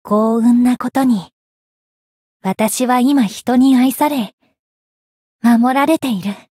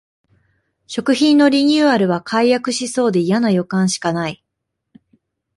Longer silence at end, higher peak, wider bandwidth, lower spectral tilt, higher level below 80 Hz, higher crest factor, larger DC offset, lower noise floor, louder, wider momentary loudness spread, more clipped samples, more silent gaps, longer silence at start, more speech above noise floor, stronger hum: second, 0.2 s vs 1.2 s; about the same, -2 dBFS vs -4 dBFS; first, 16 kHz vs 11.5 kHz; about the same, -5 dB/octave vs -5 dB/octave; about the same, -60 dBFS vs -60 dBFS; about the same, 12 dB vs 14 dB; neither; first, under -90 dBFS vs -77 dBFS; about the same, -14 LUFS vs -16 LUFS; about the same, 10 LU vs 10 LU; neither; first, 1.33-2.40 s, 4.33-4.38 s, 4.59-5.39 s vs none; second, 0.05 s vs 0.9 s; first, over 76 dB vs 62 dB; neither